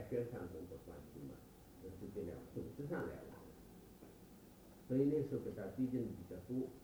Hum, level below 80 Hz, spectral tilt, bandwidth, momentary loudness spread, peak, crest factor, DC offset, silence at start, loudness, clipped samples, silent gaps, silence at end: none; -66 dBFS; -8.5 dB/octave; over 20 kHz; 21 LU; -24 dBFS; 20 dB; under 0.1%; 0 s; -44 LUFS; under 0.1%; none; 0 s